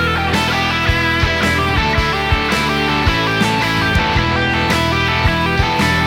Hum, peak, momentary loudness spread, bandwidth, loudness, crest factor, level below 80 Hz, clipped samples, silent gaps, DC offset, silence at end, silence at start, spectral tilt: none; -2 dBFS; 1 LU; 17.5 kHz; -15 LUFS; 14 dB; -26 dBFS; under 0.1%; none; under 0.1%; 0 s; 0 s; -5 dB/octave